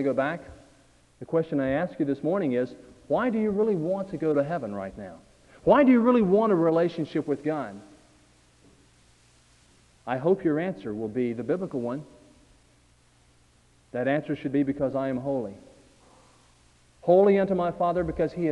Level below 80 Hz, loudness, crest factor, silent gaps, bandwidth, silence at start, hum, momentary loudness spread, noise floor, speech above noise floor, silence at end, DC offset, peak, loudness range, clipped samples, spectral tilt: -56 dBFS; -26 LUFS; 20 dB; none; 10.5 kHz; 0 s; none; 15 LU; -61 dBFS; 36 dB; 0 s; under 0.1%; -6 dBFS; 9 LU; under 0.1%; -8.5 dB/octave